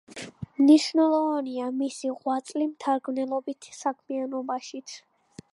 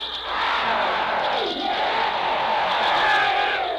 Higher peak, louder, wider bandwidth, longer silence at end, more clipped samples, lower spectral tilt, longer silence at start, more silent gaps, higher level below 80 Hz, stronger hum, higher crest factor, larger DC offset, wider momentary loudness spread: about the same, -8 dBFS vs -10 dBFS; second, -26 LUFS vs -21 LUFS; about the same, 11.5 kHz vs 12 kHz; first, 0.55 s vs 0 s; neither; first, -4.5 dB/octave vs -3 dB/octave; about the same, 0.1 s vs 0 s; neither; second, -68 dBFS vs -52 dBFS; neither; first, 18 dB vs 12 dB; neither; first, 20 LU vs 5 LU